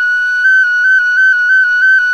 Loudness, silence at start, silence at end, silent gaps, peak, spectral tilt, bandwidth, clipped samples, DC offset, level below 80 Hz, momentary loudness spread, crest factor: -8 LUFS; 0 s; 0 s; none; -4 dBFS; 4 dB/octave; 9.8 kHz; under 0.1%; under 0.1%; -54 dBFS; 2 LU; 6 dB